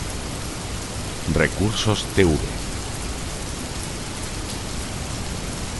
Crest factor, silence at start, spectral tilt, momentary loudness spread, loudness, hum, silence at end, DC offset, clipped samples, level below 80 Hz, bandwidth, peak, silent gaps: 22 dB; 0 s; -4.5 dB/octave; 10 LU; -25 LUFS; none; 0 s; under 0.1%; under 0.1%; -34 dBFS; 12 kHz; -2 dBFS; none